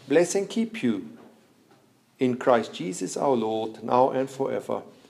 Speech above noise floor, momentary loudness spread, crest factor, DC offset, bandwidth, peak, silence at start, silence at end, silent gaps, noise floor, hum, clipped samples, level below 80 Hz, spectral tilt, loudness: 35 dB; 9 LU; 20 dB; under 0.1%; 14 kHz; -6 dBFS; 0.05 s; 0.2 s; none; -60 dBFS; none; under 0.1%; -78 dBFS; -5 dB/octave; -26 LUFS